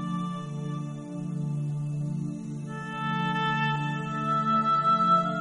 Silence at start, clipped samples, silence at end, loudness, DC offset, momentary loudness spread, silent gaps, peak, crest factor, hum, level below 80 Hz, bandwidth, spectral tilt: 0 s; under 0.1%; 0 s; -28 LUFS; under 0.1%; 13 LU; none; -12 dBFS; 16 dB; none; -64 dBFS; 10.5 kHz; -6.5 dB/octave